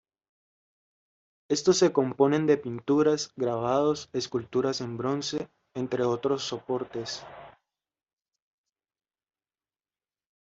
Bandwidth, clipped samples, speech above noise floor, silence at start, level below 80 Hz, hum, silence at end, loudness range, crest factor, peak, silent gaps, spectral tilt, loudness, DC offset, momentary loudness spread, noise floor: 8 kHz; under 0.1%; over 63 dB; 1.5 s; -68 dBFS; none; 2.9 s; 13 LU; 20 dB; -10 dBFS; none; -5 dB/octave; -27 LUFS; under 0.1%; 12 LU; under -90 dBFS